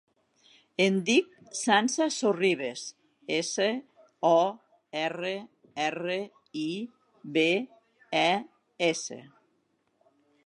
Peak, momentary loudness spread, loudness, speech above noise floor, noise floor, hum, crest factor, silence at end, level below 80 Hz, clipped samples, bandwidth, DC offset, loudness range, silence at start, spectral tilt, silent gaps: -6 dBFS; 16 LU; -28 LUFS; 46 dB; -73 dBFS; none; 24 dB; 1.2 s; -84 dBFS; under 0.1%; 11.5 kHz; under 0.1%; 4 LU; 0.8 s; -3.5 dB/octave; none